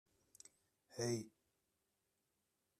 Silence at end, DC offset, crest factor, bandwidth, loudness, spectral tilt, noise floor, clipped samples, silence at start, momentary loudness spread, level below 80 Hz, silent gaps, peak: 1.5 s; under 0.1%; 24 dB; 14 kHz; -45 LUFS; -4.5 dB/octave; -87 dBFS; under 0.1%; 0.9 s; 20 LU; -86 dBFS; none; -28 dBFS